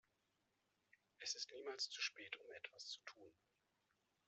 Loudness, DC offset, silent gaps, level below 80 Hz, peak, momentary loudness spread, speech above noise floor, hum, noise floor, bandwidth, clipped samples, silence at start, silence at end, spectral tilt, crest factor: -49 LUFS; under 0.1%; none; under -90 dBFS; -30 dBFS; 11 LU; 34 dB; none; -86 dBFS; 8.2 kHz; under 0.1%; 1.2 s; 0.95 s; 1 dB/octave; 24 dB